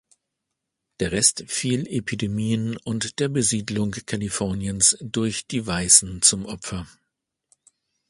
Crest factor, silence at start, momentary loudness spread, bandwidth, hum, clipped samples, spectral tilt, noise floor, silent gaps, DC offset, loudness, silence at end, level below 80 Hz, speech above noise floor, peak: 24 dB; 1 s; 14 LU; 11.5 kHz; none; under 0.1%; -3 dB/octave; -82 dBFS; none; under 0.1%; -21 LUFS; 1.25 s; -48 dBFS; 58 dB; 0 dBFS